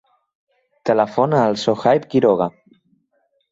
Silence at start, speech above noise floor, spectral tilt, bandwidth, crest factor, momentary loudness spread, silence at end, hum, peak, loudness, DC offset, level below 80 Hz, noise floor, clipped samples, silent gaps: 0.85 s; 50 dB; -6.5 dB/octave; 8 kHz; 18 dB; 5 LU; 1 s; none; -2 dBFS; -18 LUFS; under 0.1%; -60 dBFS; -66 dBFS; under 0.1%; none